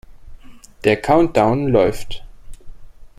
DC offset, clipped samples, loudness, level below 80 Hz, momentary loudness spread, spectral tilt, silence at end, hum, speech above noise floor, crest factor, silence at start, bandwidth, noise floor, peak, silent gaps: under 0.1%; under 0.1%; -16 LUFS; -36 dBFS; 18 LU; -6.5 dB/octave; 0.1 s; none; 22 dB; 18 dB; 0.1 s; 15.5 kHz; -38 dBFS; -2 dBFS; none